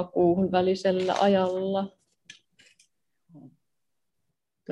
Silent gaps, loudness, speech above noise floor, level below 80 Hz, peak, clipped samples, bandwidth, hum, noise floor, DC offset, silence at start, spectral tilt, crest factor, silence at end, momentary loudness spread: none; -25 LUFS; 61 dB; -66 dBFS; -10 dBFS; under 0.1%; 9.8 kHz; none; -85 dBFS; under 0.1%; 0 s; -6.5 dB/octave; 18 dB; 0 s; 7 LU